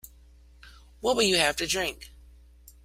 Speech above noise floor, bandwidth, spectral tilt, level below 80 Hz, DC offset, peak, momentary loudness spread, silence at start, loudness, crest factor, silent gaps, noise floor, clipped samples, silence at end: 28 dB; 16 kHz; -2 dB/octave; -52 dBFS; under 0.1%; -6 dBFS; 11 LU; 0.65 s; -25 LUFS; 24 dB; none; -54 dBFS; under 0.1%; 0.75 s